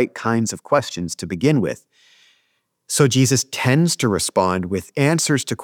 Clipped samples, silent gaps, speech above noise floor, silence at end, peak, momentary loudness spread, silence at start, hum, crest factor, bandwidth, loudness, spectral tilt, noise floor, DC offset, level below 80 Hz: under 0.1%; none; 50 dB; 0 s; -2 dBFS; 9 LU; 0 s; none; 18 dB; 19 kHz; -19 LUFS; -4.5 dB/octave; -68 dBFS; under 0.1%; -60 dBFS